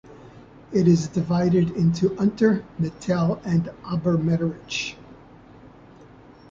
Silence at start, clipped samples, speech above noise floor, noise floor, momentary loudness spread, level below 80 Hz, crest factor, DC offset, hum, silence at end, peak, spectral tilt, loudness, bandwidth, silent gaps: 0.1 s; under 0.1%; 26 dB; -48 dBFS; 9 LU; -52 dBFS; 18 dB; under 0.1%; none; 0.5 s; -6 dBFS; -7 dB/octave; -23 LUFS; 7.6 kHz; none